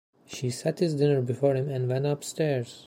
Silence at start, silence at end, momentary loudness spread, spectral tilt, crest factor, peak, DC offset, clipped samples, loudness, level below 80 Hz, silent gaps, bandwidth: 0.3 s; 0.05 s; 7 LU; -6.5 dB/octave; 16 dB; -10 dBFS; under 0.1%; under 0.1%; -27 LUFS; -68 dBFS; none; 16 kHz